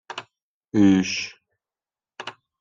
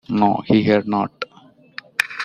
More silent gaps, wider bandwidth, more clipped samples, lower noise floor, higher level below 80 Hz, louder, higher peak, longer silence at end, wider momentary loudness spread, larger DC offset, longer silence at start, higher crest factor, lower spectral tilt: first, 0.42-0.61 s vs none; second, 7.6 kHz vs 15.5 kHz; neither; first, under -90 dBFS vs -50 dBFS; second, -64 dBFS vs -56 dBFS; about the same, -21 LUFS vs -19 LUFS; second, -6 dBFS vs -2 dBFS; first, 0.3 s vs 0 s; about the same, 20 LU vs 18 LU; neither; about the same, 0.1 s vs 0.1 s; about the same, 18 dB vs 18 dB; about the same, -5.5 dB/octave vs -6.5 dB/octave